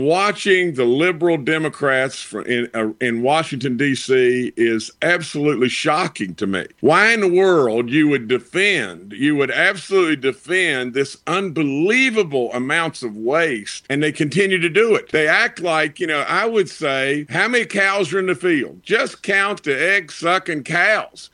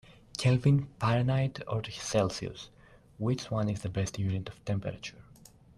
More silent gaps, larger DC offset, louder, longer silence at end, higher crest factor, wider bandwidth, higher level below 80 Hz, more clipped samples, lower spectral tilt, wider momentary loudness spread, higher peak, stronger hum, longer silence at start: neither; neither; first, -18 LUFS vs -31 LUFS; second, 0.1 s vs 0.55 s; about the same, 18 dB vs 16 dB; about the same, 11.5 kHz vs 12 kHz; second, -64 dBFS vs -56 dBFS; neither; second, -4.5 dB/octave vs -6 dB/octave; second, 6 LU vs 15 LU; first, 0 dBFS vs -14 dBFS; neither; about the same, 0 s vs 0.1 s